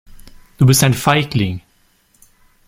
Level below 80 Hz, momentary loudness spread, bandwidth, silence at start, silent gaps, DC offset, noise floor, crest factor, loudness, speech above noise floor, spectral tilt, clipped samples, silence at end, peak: -42 dBFS; 10 LU; 16.5 kHz; 0.25 s; none; under 0.1%; -57 dBFS; 16 dB; -14 LUFS; 43 dB; -4.5 dB/octave; under 0.1%; 1.1 s; 0 dBFS